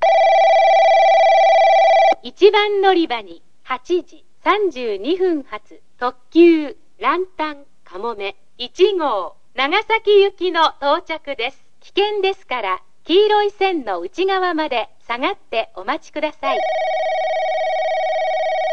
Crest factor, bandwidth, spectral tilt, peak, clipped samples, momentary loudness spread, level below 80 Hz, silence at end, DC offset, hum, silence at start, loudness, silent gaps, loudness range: 16 dB; 7.4 kHz; -3 dB/octave; 0 dBFS; under 0.1%; 14 LU; -60 dBFS; 0 s; 2%; none; 0 s; -17 LUFS; none; 7 LU